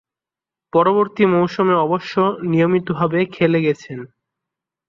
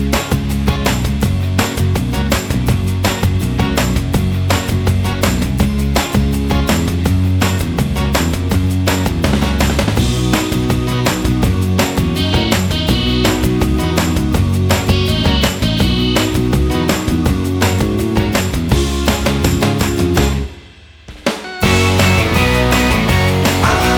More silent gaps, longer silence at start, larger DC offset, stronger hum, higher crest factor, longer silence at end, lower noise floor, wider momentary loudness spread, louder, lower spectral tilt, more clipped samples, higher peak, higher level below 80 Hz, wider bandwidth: neither; first, 0.75 s vs 0 s; neither; neither; about the same, 16 dB vs 14 dB; first, 0.8 s vs 0 s; first, -88 dBFS vs -39 dBFS; about the same, 5 LU vs 4 LU; about the same, -17 LUFS vs -15 LUFS; first, -8 dB/octave vs -5 dB/octave; neither; about the same, -2 dBFS vs 0 dBFS; second, -60 dBFS vs -22 dBFS; second, 7.2 kHz vs 20 kHz